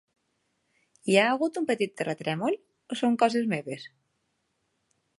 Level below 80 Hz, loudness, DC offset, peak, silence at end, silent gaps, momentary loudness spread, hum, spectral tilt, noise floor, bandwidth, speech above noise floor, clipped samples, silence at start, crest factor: -80 dBFS; -27 LUFS; under 0.1%; -4 dBFS; 1.3 s; none; 15 LU; none; -5 dB/octave; -76 dBFS; 11.5 kHz; 50 dB; under 0.1%; 1.05 s; 24 dB